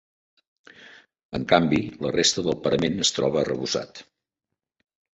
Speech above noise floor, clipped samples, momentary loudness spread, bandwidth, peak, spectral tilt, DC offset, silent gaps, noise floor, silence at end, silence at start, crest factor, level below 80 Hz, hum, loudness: 62 dB; under 0.1%; 10 LU; 8.2 kHz; -2 dBFS; -3.5 dB/octave; under 0.1%; 1.25-1.29 s; -86 dBFS; 1.1 s; 0.8 s; 24 dB; -54 dBFS; none; -23 LUFS